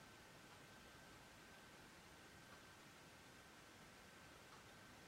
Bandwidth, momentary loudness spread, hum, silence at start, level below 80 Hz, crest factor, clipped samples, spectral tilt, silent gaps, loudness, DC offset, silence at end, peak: 16 kHz; 1 LU; none; 0 s; -78 dBFS; 14 dB; under 0.1%; -3 dB/octave; none; -62 LUFS; under 0.1%; 0 s; -48 dBFS